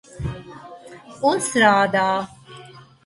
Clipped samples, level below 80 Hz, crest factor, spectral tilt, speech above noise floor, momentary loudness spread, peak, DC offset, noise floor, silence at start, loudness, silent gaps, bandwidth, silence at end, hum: under 0.1%; -48 dBFS; 20 dB; -4 dB/octave; 26 dB; 25 LU; -2 dBFS; under 0.1%; -44 dBFS; 0.15 s; -19 LUFS; none; 11.5 kHz; 0.25 s; none